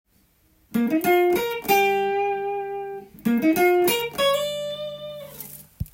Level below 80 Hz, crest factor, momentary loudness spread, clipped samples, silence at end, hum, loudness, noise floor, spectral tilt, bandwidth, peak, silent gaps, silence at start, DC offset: -52 dBFS; 18 dB; 17 LU; under 0.1%; 0.05 s; none; -22 LUFS; -62 dBFS; -4 dB/octave; 17 kHz; -6 dBFS; none; 0.7 s; under 0.1%